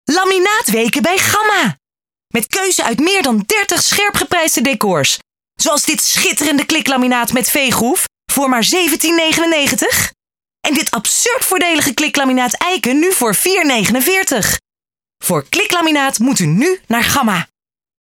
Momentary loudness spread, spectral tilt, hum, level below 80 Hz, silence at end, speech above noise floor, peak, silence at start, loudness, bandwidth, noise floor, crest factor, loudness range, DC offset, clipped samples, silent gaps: 5 LU; -2.5 dB/octave; none; -48 dBFS; 0.55 s; over 76 dB; 0 dBFS; 0.05 s; -13 LUFS; 19 kHz; under -90 dBFS; 14 dB; 1 LU; under 0.1%; under 0.1%; none